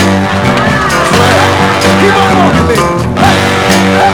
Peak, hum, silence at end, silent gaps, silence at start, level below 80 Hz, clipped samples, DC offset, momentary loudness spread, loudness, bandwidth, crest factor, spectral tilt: 0 dBFS; none; 0 s; none; 0 s; -28 dBFS; 1%; under 0.1%; 3 LU; -7 LUFS; over 20 kHz; 8 dB; -5 dB/octave